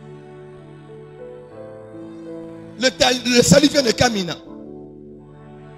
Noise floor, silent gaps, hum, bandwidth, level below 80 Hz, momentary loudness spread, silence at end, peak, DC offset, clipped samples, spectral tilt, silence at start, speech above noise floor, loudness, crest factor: -41 dBFS; none; 50 Hz at -50 dBFS; 15.5 kHz; -46 dBFS; 27 LU; 0.1 s; 0 dBFS; under 0.1%; under 0.1%; -4 dB/octave; 0.05 s; 24 dB; -16 LUFS; 20 dB